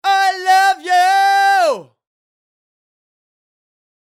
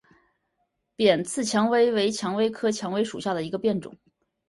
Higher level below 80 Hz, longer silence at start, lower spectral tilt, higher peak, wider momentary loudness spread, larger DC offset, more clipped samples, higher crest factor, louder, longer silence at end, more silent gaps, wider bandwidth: second, -72 dBFS vs -66 dBFS; second, 0.05 s vs 1 s; second, 0 dB/octave vs -4.5 dB/octave; first, -4 dBFS vs -8 dBFS; second, 4 LU vs 7 LU; neither; neither; about the same, 14 dB vs 18 dB; first, -13 LUFS vs -25 LUFS; first, 2.25 s vs 0.6 s; neither; first, 15 kHz vs 11.5 kHz